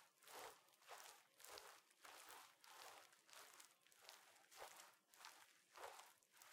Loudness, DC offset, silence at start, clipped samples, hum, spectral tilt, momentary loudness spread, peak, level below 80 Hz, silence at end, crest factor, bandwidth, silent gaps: -63 LUFS; under 0.1%; 0 s; under 0.1%; none; 0.5 dB/octave; 7 LU; -38 dBFS; under -90 dBFS; 0 s; 26 dB; 16.5 kHz; none